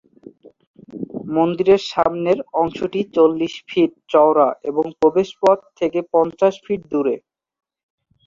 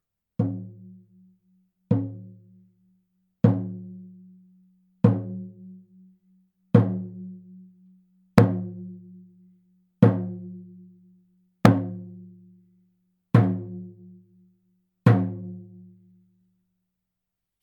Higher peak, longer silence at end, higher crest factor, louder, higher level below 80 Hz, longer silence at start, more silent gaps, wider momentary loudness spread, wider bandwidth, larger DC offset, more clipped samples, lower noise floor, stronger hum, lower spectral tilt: about the same, -2 dBFS vs 0 dBFS; second, 1.1 s vs 2 s; second, 18 dB vs 28 dB; first, -18 LUFS vs -24 LUFS; about the same, -58 dBFS vs -58 dBFS; second, 0.25 s vs 0.4 s; first, 0.67-0.74 s vs none; second, 8 LU vs 23 LU; second, 7.6 kHz vs 9.4 kHz; neither; neither; second, -44 dBFS vs -84 dBFS; neither; second, -6.5 dB/octave vs -9 dB/octave